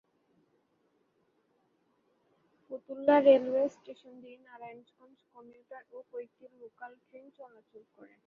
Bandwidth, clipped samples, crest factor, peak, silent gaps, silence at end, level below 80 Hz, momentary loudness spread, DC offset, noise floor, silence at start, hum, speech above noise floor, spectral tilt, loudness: 6.8 kHz; under 0.1%; 24 dB; -10 dBFS; none; 0.8 s; -82 dBFS; 29 LU; under 0.1%; -74 dBFS; 2.7 s; none; 42 dB; -3 dB/octave; -26 LUFS